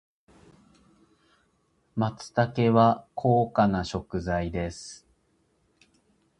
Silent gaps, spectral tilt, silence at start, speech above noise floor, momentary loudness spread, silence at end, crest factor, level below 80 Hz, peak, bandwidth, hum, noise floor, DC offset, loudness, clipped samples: none; -7 dB/octave; 1.95 s; 44 dB; 14 LU; 1.45 s; 22 dB; -50 dBFS; -6 dBFS; 10.5 kHz; none; -69 dBFS; under 0.1%; -26 LUFS; under 0.1%